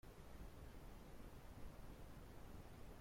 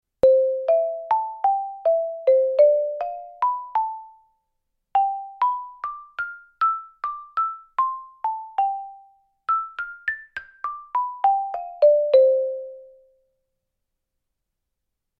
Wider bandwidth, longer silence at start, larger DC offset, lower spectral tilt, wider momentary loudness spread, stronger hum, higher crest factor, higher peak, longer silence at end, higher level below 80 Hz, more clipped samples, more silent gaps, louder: first, 16.5 kHz vs 5 kHz; second, 0.05 s vs 0.25 s; neither; about the same, -6 dB/octave vs -5 dB/octave; second, 1 LU vs 15 LU; neither; second, 12 dB vs 18 dB; second, -44 dBFS vs -6 dBFS; second, 0 s vs 2.35 s; about the same, -60 dBFS vs -64 dBFS; neither; neither; second, -61 LUFS vs -23 LUFS